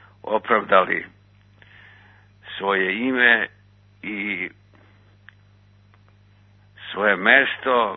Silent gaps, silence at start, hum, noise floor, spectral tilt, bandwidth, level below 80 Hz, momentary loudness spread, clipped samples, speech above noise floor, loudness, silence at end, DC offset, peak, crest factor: none; 0.25 s; 50 Hz at -55 dBFS; -54 dBFS; -7 dB/octave; 4.2 kHz; -64 dBFS; 18 LU; under 0.1%; 34 dB; -20 LUFS; 0 s; under 0.1%; 0 dBFS; 24 dB